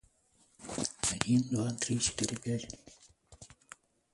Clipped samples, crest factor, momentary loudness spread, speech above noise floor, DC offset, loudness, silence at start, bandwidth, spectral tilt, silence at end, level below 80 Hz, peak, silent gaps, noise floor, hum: under 0.1%; 28 dB; 25 LU; 36 dB; under 0.1%; -33 LUFS; 0.6 s; 11.5 kHz; -4 dB/octave; 0.65 s; -60 dBFS; -8 dBFS; none; -69 dBFS; none